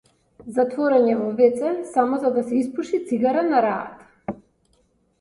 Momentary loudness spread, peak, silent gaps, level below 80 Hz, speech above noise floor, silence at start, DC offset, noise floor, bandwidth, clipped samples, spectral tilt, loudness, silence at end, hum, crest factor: 16 LU; -4 dBFS; none; -64 dBFS; 43 dB; 0.4 s; under 0.1%; -64 dBFS; 11.5 kHz; under 0.1%; -6.5 dB/octave; -21 LUFS; 0.85 s; none; 18 dB